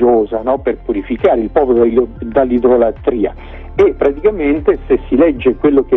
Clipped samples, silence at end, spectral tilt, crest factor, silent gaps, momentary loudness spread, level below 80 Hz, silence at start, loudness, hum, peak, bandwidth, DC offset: under 0.1%; 0 s; -9 dB/octave; 12 dB; none; 7 LU; -32 dBFS; 0 s; -13 LUFS; none; 0 dBFS; 4 kHz; under 0.1%